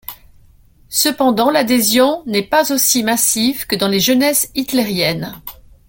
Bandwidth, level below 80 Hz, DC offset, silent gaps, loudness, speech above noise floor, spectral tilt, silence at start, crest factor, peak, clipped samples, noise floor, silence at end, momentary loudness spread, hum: 17 kHz; -48 dBFS; under 0.1%; none; -14 LUFS; 32 dB; -2.5 dB/octave; 0.1 s; 16 dB; 0 dBFS; under 0.1%; -47 dBFS; 0.35 s; 8 LU; none